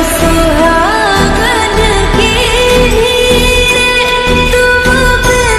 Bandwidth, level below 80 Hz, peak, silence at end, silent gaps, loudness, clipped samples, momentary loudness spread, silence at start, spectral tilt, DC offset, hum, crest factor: 16 kHz; -16 dBFS; 0 dBFS; 0 s; none; -8 LUFS; 0.1%; 2 LU; 0 s; -3.5 dB/octave; under 0.1%; none; 8 dB